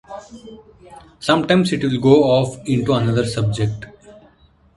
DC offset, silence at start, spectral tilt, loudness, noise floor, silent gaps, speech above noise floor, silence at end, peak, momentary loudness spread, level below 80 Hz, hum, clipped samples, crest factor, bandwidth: under 0.1%; 0.1 s; -6.5 dB/octave; -17 LUFS; -53 dBFS; none; 35 dB; 0.65 s; 0 dBFS; 22 LU; -48 dBFS; none; under 0.1%; 18 dB; 11.5 kHz